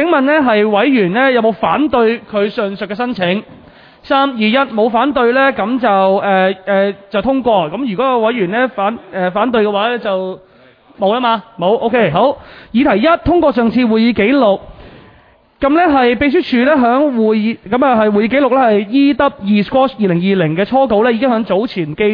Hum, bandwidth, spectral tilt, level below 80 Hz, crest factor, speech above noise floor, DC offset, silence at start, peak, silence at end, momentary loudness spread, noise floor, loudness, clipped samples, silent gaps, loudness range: none; 5.2 kHz; -9 dB/octave; -44 dBFS; 12 dB; 35 dB; under 0.1%; 0 s; 0 dBFS; 0 s; 7 LU; -47 dBFS; -13 LUFS; under 0.1%; none; 4 LU